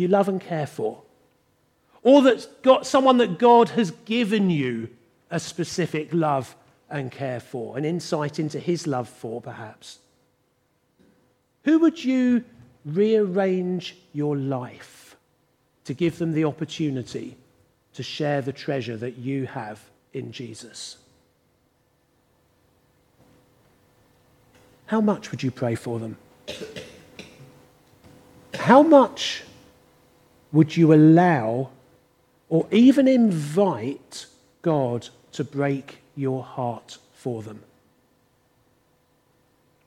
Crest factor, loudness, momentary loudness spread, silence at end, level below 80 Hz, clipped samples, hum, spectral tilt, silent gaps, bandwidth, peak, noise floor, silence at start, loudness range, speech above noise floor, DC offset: 22 dB; -22 LUFS; 22 LU; 2.3 s; -70 dBFS; under 0.1%; none; -6.5 dB/octave; none; 13 kHz; -2 dBFS; -68 dBFS; 0 s; 14 LU; 46 dB; under 0.1%